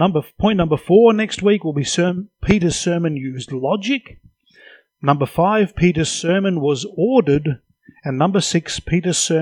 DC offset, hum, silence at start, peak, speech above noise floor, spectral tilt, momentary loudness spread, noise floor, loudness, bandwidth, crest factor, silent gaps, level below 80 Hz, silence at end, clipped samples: under 0.1%; none; 0 s; 0 dBFS; 31 dB; -5 dB/octave; 9 LU; -48 dBFS; -18 LUFS; 16.5 kHz; 18 dB; none; -42 dBFS; 0 s; under 0.1%